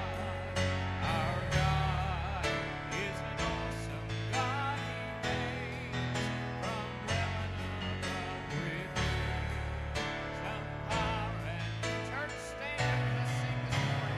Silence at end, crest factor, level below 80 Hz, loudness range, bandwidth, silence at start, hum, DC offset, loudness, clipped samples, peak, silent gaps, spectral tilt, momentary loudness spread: 0 s; 16 dB; -46 dBFS; 3 LU; 13.5 kHz; 0 s; none; under 0.1%; -35 LUFS; under 0.1%; -18 dBFS; none; -5 dB/octave; 6 LU